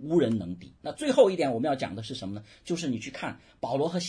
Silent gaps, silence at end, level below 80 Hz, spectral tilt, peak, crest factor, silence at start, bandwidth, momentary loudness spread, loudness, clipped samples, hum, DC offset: none; 0 s; -62 dBFS; -5.5 dB/octave; -8 dBFS; 20 dB; 0 s; 10.5 kHz; 17 LU; -28 LUFS; under 0.1%; none; under 0.1%